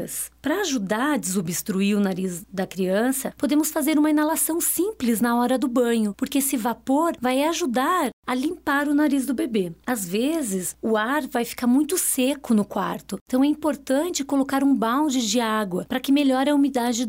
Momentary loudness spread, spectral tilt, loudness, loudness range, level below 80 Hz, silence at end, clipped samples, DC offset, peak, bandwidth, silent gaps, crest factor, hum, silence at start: 6 LU; -4 dB/octave; -23 LUFS; 2 LU; -58 dBFS; 0 s; under 0.1%; under 0.1%; -10 dBFS; 16.5 kHz; 8.13-8.23 s, 13.21-13.26 s; 12 dB; none; 0 s